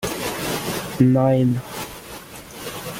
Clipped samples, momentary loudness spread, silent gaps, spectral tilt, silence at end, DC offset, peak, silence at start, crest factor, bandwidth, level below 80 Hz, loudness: under 0.1%; 19 LU; none; -6 dB/octave; 0 s; under 0.1%; -4 dBFS; 0 s; 18 dB; 17 kHz; -48 dBFS; -21 LUFS